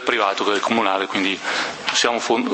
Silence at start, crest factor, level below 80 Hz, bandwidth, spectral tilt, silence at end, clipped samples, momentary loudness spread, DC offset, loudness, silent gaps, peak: 0 s; 18 dB; -68 dBFS; 8.8 kHz; -2 dB/octave; 0 s; under 0.1%; 4 LU; under 0.1%; -20 LUFS; none; -2 dBFS